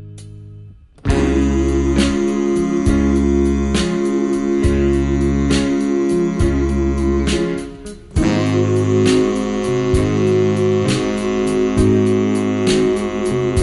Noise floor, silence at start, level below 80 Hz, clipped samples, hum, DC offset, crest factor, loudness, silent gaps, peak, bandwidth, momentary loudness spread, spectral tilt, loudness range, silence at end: -39 dBFS; 0 s; -26 dBFS; under 0.1%; none; under 0.1%; 14 dB; -17 LUFS; none; -2 dBFS; 11.5 kHz; 5 LU; -6.5 dB/octave; 2 LU; 0 s